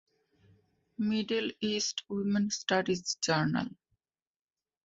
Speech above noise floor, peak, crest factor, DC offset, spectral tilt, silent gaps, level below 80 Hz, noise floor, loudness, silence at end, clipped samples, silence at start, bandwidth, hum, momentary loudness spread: over 59 dB; -14 dBFS; 20 dB; under 0.1%; -4 dB/octave; none; -70 dBFS; under -90 dBFS; -31 LUFS; 1.15 s; under 0.1%; 1 s; 7.8 kHz; none; 6 LU